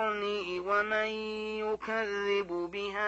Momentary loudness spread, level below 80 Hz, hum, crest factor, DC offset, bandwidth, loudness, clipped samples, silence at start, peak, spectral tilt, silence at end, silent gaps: 6 LU; -64 dBFS; none; 16 dB; under 0.1%; 8.2 kHz; -32 LUFS; under 0.1%; 0 s; -18 dBFS; -4.5 dB/octave; 0 s; none